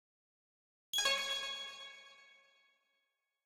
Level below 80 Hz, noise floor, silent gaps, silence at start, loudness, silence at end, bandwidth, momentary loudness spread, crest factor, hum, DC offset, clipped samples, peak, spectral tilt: -84 dBFS; -85 dBFS; none; 0.95 s; -36 LUFS; 1.15 s; 16 kHz; 21 LU; 24 dB; none; under 0.1%; under 0.1%; -20 dBFS; 2.5 dB/octave